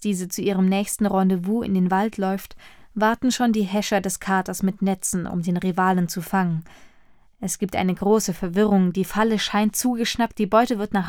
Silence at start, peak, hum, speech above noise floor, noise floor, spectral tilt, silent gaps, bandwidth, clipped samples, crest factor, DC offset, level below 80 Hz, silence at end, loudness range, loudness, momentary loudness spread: 0 s; -6 dBFS; none; 30 dB; -52 dBFS; -5 dB/octave; none; 18 kHz; under 0.1%; 16 dB; under 0.1%; -50 dBFS; 0 s; 3 LU; -22 LUFS; 6 LU